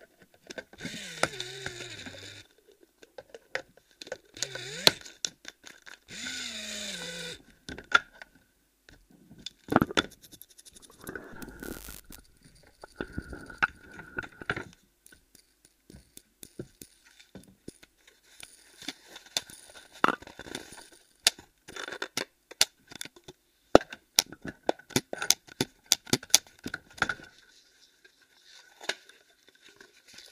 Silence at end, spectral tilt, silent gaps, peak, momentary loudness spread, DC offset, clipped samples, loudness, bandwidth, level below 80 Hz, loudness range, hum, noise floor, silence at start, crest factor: 0.1 s; -2 dB/octave; none; 0 dBFS; 24 LU; under 0.1%; under 0.1%; -31 LUFS; 15.5 kHz; -58 dBFS; 16 LU; none; -68 dBFS; 0.5 s; 36 dB